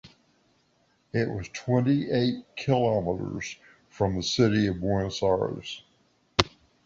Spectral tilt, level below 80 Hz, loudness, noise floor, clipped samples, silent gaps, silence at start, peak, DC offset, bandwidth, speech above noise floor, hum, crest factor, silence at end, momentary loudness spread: -6 dB/octave; -50 dBFS; -27 LUFS; -68 dBFS; under 0.1%; none; 0.05 s; -2 dBFS; under 0.1%; 8 kHz; 42 dB; none; 26 dB; 0.35 s; 12 LU